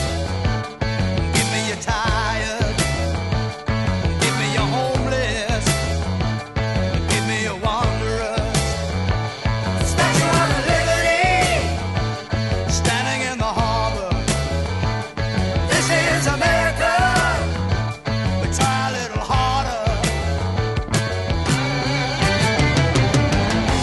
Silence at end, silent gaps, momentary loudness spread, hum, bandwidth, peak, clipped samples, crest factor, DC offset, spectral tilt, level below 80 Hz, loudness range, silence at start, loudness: 0 s; none; 6 LU; none; 12 kHz; -4 dBFS; under 0.1%; 16 dB; 0.1%; -4.5 dB/octave; -30 dBFS; 3 LU; 0 s; -20 LUFS